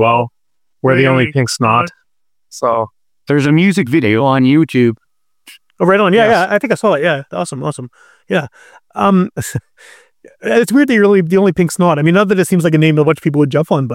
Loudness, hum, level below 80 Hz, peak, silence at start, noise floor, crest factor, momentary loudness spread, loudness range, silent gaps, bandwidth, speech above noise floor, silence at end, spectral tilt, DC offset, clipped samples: -13 LUFS; none; -54 dBFS; -2 dBFS; 0 s; -75 dBFS; 12 dB; 12 LU; 5 LU; none; 16 kHz; 63 dB; 0 s; -6.5 dB/octave; under 0.1%; under 0.1%